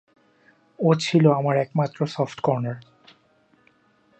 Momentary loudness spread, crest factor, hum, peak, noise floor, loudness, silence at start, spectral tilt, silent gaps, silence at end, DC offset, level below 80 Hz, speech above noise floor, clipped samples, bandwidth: 9 LU; 20 dB; none; -4 dBFS; -61 dBFS; -22 LUFS; 0.8 s; -7 dB/octave; none; 1.4 s; under 0.1%; -70 dBFS; 40 dB; under 0.1%; 8.6 kHz